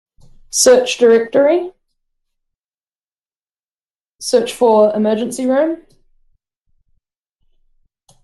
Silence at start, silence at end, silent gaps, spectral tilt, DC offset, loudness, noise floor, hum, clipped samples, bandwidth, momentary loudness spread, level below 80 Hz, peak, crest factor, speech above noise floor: 0.55 s; 2.5 s; 2.55-2.59 s, 3.07-3.11 s, 3.59-3.75 s, 3.81-4.05 s, 4.15-4.19 s; -3 dB/octave; under 0.1%; -14 LUFS; under -90 dBFS; none; under 0.1%; 12.5 kHz; 10 LU; -56 dBFS; 0 dBFS; 16 dB; over 77 dB